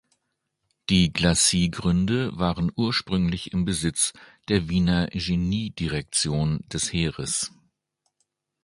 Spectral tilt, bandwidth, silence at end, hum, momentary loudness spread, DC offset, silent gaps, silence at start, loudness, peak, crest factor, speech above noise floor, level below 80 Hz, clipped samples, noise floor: -4 dB/octave; 11.5 kHz; 1.15 s; none; 7 LU; under 0.1%; none; 0.9 s; -24 LUFS; -4 dBFS; 20 dB; 54 dB; -42 dBFS; under 0.1%; -78 dBFS